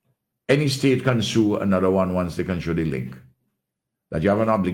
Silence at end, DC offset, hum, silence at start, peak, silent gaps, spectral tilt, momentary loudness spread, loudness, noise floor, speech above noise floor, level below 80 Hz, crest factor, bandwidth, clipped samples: 0 s; under 0.1%; none; 0.5 s; -6 dBFS; none; -6.5 dB/octave; 9 LU; -22 LUFS; -82 dBFS; 61 dB; -50 dBFS; 16 dB; 16.5 kHz; under 0.1%